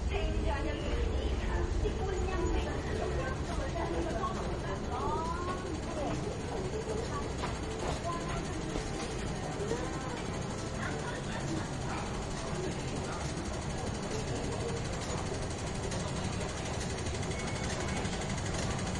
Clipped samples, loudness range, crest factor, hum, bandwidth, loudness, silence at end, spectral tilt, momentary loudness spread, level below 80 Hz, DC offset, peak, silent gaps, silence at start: under 0.1%; 2 LU; 16 dB; none; 11.5 kHz; -36 LUFS; 0 s; -5 dB/octave; 3 LU; -40 dBFS; under 0.1%; -20 dBFS; none; 0 s